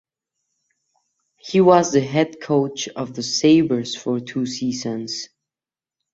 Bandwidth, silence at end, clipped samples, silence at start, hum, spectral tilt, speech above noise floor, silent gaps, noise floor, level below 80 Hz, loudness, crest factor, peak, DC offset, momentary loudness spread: 8 kHz; 0.9 s; under 0.1%; 1.45 s; none; -5 dB/octave; over 71 dB; none; under -90 dBFS; -62 dBFS; -20 LUFS; 20 dB; -2 dBFS; under 0.1%; 13 LU